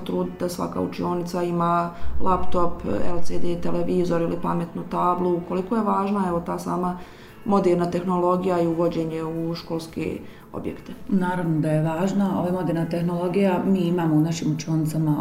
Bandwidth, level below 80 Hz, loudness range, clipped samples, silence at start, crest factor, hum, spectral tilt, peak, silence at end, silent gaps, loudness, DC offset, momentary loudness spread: 16 kHz; -44 dBFS; 3 LU; under 0.1%; 0 s; 14 dB; none; -7.5 dB/octave; -8 dBFS; 0 s; none; -24 LUFS; under 0.1%; 8 LU